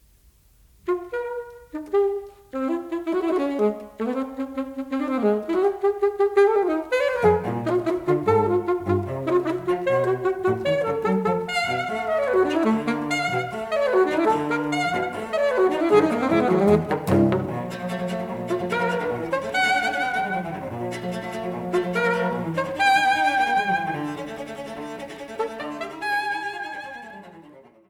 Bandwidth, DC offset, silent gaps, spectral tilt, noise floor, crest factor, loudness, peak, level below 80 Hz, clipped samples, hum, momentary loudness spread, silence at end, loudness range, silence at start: 17 kHz; under 0.1%; none; -6 dB/octave; -56 dBFS; 20 dB; -23 LUFS; -4 dBFS; -56 dBFS; under 0.1%; none; 12 LU; 0.3 s; 5 LU; 0.85 s